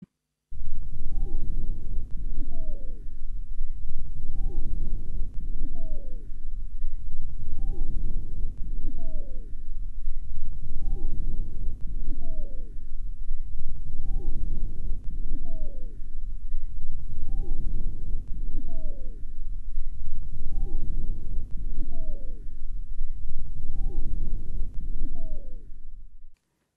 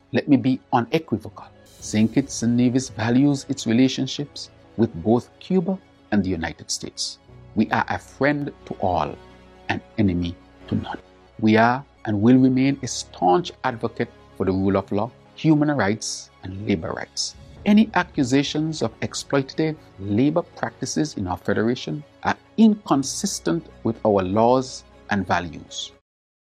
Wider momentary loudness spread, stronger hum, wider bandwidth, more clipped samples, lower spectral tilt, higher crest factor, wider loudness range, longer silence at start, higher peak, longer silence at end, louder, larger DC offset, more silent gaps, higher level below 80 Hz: second, 7 LU vs 13 LU; neither; second, 0.7 kHz vs 13.5 kHz; neither; first, -9.5 dB/octave vs -5.5 dB/octave; second, 10 dB vs 20 dB; second, 1 LU vs 4 LU; first, 0.5 s vs 0.15 s; second, -10 dBFS vs -2 dBFS; second, 0.45 s vs 0.7 s; second, -38 LUFS vs -22 LUFS; neither; neither; first, -26 dBFS vs -52 dBFS